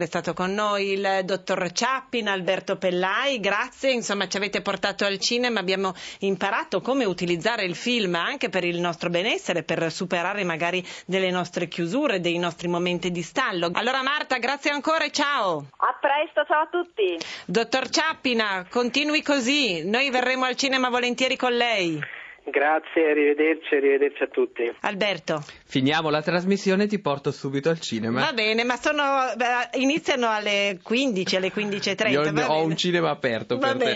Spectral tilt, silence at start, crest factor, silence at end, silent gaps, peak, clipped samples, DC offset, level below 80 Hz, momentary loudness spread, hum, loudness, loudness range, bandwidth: -4 dB/octave; 0 s; 20 dB; 0 s; none; -4 dBFS; under 0.1%; under 0.1%; -66 dBFS; 5 LU; none; -24 LUFS; 3 LU; 8 kHz